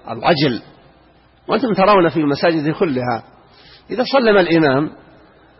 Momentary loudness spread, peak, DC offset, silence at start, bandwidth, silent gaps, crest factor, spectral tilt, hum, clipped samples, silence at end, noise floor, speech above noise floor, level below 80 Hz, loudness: 11 LU; -2 dBFS; under 0.1%; 0.05 s; 5.8 kHz; none; 14 dB; -10 dB/octave; none; under 0.1%; 0.7 s; -51 dBFS; 35 dB; -52 dBFS; -16 LUFS